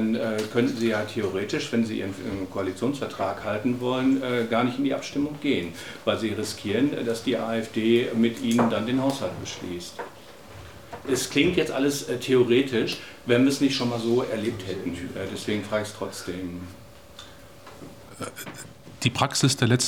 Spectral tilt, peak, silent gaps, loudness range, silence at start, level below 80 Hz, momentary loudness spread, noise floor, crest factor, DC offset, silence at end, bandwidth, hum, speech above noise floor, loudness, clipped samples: -5 dB/octave; -6 dBFS; none; 9 LU; 0 s; -58 dBFS; 18 LU; -46 dBFS; 20 dB; 0.2%; 0 s; 18.5 kHz; none; 21 dB; -26 LUFS; under 0.1%